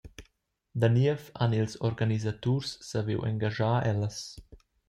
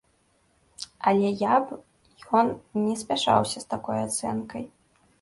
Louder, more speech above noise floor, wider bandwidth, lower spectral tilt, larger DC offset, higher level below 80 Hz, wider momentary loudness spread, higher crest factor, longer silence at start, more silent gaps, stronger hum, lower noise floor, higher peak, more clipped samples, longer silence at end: second, -29 LUFS vs -25 LUFS; about the same, 44 dB vs 41 dB; about the same, 11.5 kHz vs 11.5 kHz; first, -6.5 dB/octave vs -4.5 dB/octave; neither; about the same, -58 dBFS vs -62 dBFS; second, 8 LU vs 16 LU; about the same, 18 dB vs 20 dB; second, 0.05 s vs 0.8 s; neither; neither; first, -72 dBFS vs -66 dBFS; second, -12 dBFS vs -6 dBFS; neither; second, 0.35 s vs 0.55 s